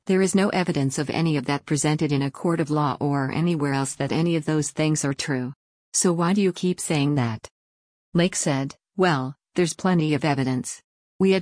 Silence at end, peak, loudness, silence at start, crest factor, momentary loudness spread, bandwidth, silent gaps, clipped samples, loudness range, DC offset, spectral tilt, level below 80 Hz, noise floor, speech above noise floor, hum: 0 s; -8 dBFS; -23 LUFS; 0.05 s; 16 dB; 6 LU; 10.5 kHz; 5.56-5.92 s, 7.51-8.12 s, 10.84-11.19 s; under 0.1%; 1 LU; under 0.1%; -5 dB/octave; -58 dBFS; under -90 dBFS; over 67 dB; none